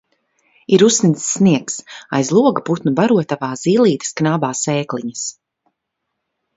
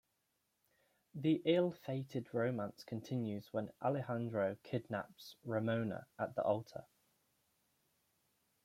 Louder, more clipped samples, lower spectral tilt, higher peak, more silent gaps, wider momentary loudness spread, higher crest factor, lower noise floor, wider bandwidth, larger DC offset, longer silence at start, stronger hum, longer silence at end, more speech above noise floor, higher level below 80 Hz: first, -16 LUFS vs -39 LUFS; neither; second, -5 dB/octave vs -7.5 dB/octave; first, 0 dBFS vs -20 dBFS; neither; about the same, 12 LU vs 10 LU; about the same, 16 dB vs 20 dB; second, -76 dBFS vs -83 dBFS; second, 8 kHz vs 16.5 kHz; neither; second, 0.7 s vs 1.15 s; neither; second, 1.25 s vs 1.8 s; first, 61 dB vs 45 dB; first, -60 dBFS vs -80 dBFS